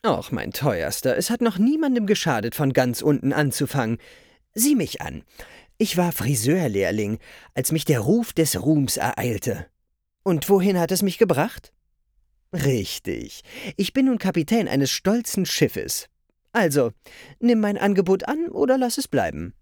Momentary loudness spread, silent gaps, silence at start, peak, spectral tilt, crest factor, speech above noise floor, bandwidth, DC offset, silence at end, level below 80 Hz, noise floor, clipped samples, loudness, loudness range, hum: 9 LU; none; 0.05 s; -4 dBFS; -5 dB/octave; 18 dB; 51 dB; over 20 kHz; under 0.1%; 0.1 s; -52 dBFS; -73 dBFS; under 0.1%; -22 LUFS; 2 LU; none